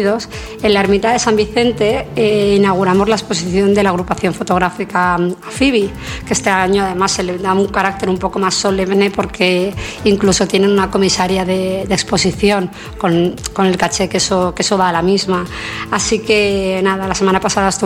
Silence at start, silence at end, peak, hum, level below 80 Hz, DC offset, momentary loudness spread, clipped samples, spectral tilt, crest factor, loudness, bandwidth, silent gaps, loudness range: 0 s; 0 s; 0 dBFS; none; -36 dBFS; under 0.1%; 6 LU; under 0.1%; -4.5 dB/octave; 14 dB; -14 LUFS; 15.5 kHz; none; 2 LU